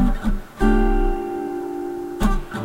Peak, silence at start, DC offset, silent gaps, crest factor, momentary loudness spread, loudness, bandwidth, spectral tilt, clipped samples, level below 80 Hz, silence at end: -6 dBFS; 0 s; under 0.1%; none; 14 dB; 9 LU; -23 LUFS; 15.5 kHz; -7 dB/octave; under 0.1%; -22 dBFS; 0 s